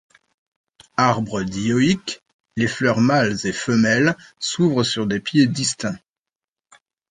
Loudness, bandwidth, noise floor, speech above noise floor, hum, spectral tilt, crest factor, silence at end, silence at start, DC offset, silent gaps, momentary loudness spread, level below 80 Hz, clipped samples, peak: -20 LUFS; 9.8 kHz; -89 dBFS; 70 dB; none; -5 dB/octave; 18 dB; 1.15 s; 1 s; under 0.1%; 2.33-2.44 s; 11 LU; -54 dBFS; under 0.1%; -2 dBFS